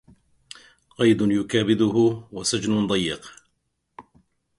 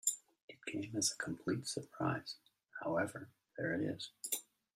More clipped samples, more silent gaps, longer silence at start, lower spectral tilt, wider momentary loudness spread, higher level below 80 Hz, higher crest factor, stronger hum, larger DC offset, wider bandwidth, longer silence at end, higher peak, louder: neither; second, none vs 0.43-0.48 s; first, 1 s vs 0.05 s; first, -5 dB/octave vs -3.5 dB/octave; first, 19 LU vs 15 LU; first, -56 dBFS vs -78 dBFS; about the same, 18 dB vs 22 dB; neither; neither; second, 11.5 kHz vs 16 kHz; first, 0.55 s vs 0.35 s; first, -6 dBFS vs -20 dBFS; first, -22 LUFS vs -40 LUFS